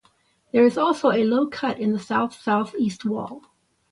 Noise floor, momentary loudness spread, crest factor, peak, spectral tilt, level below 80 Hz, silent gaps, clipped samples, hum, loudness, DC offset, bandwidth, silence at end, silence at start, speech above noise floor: -63 dBFS; 9 LU; 16 dB; -6 dBFS; -6 dB/octave; -66 dBFS; none; under 0.1%; none; -22 LUFS; under 0.1%; 11.5 kHz; 0.55 s; 0.55 s; 41 dB